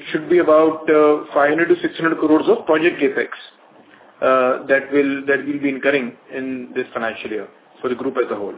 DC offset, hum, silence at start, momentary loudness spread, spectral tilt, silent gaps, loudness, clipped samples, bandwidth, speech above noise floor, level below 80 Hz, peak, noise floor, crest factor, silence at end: under 0.1%; none; 0 s; 13 LU; -9.5 dB/octave; none; -18 LUFS; under 0.1%; 4 kHz; 30 dB; -64 dBFS; -2 dBFS; -47 dBFS; 16 dB; 0 s